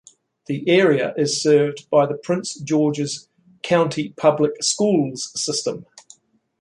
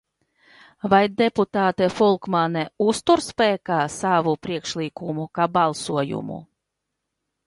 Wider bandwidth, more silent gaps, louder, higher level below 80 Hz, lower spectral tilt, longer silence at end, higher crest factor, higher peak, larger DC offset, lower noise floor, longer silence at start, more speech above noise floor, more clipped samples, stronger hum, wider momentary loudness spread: about the same, 11.5 kHz vs 11.5 kHz; neither; about the same, -20 LUFS vs -22 LUFS; second, -66 dBFS vs -60 dBFS; about the same, -4.5 dB/octave vs -5 dB/octave; second, 0.8 s vs 1 s; about the same, 18 dB vs 20 dB; about the same, -2 dBFS vs -2 dBFS; neither; second, -52 dBFS vs -80 dBFS; second, 0.5 s vs 0.85 s; second, 33 dB vs 59 dB; neither; neither; about the same, 10 LU vs 10 LU